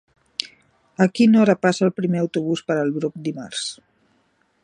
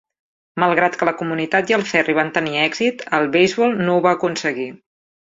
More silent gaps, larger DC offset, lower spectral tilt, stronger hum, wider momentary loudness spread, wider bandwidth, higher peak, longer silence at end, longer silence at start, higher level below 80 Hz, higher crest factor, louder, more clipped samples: neither; neither; about the same, -6 dB/octave vs -5 dB/octave; neither; first, 15 LU vs 7 LU; first, 10 kHz vs 7.8 kHz; about the same, 0 dBFS vs -2 dBFS; first, 0.9 s vs 0.55 s; second, 0.4 s vs 0.55 s; second, -68 dBFS vs -62 dBFS; about the same, 20 dB vs 18 dB; second, -21 LUFS vs -18 LUFS; neither